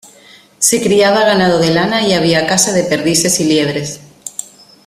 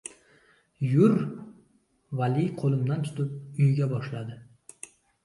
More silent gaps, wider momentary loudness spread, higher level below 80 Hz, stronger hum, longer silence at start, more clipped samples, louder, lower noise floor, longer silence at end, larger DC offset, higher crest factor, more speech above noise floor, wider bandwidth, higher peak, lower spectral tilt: neither; second, 15 LU vs 23 LU; first, -50 dBFS vs -66 dBFS; neither; first, 0.6 s vs 0.05 s; neither; first, -12 LUFS vs -27 LUFS; second, -43 dBFS vs -66 dBFS; second, 0.4 s vs 0.8 s; neither; second, 14 dB vs 20 dB; second, 31 dB vs 41 dB; first, 16 kHz vs 11.5 kHz; first, 0 dBFS vs -8 dBFS; second, -3.5 dB/octave vs -8 dB/octave